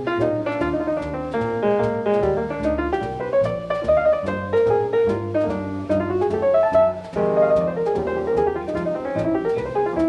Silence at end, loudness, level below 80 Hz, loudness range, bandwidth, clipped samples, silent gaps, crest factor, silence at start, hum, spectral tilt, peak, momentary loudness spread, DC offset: 0 s; -21 LUFS; -42 dBFS; 2 LU; 9.8 kHz; under 0.1%; none; 14 dB; 0 s; none; -8 dB/octave; -6 dBFS; 6 LU; under 0.1%